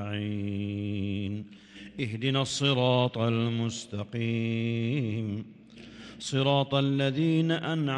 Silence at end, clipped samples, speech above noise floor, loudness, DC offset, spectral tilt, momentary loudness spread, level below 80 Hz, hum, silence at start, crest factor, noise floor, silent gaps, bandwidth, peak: 0 s; under 0.1%; 20 dB; -29 LUFS; under 0.1%; -6 dB/octave; 14 LU; -66 dBFS; none; 0 s; 18 dB; -48 dBFS; none; 10.5 kHz; -10 dBFS